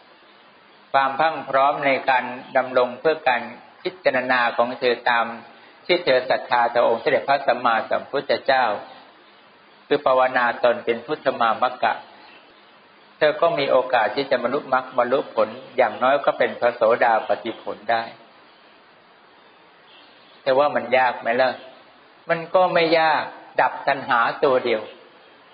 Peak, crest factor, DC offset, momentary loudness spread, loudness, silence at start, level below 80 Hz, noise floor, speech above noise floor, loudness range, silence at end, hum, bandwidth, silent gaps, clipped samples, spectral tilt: -2 dBFS; 20 dB; under 0.1%; 7 LU; -21 LUFS; 0.95 s; -72 dBFS; -51 dBFS; 31 dB; 3 LU; 0.6 s; none; 5.2 kHz; none; under 0.1%; -1.5 dB/octave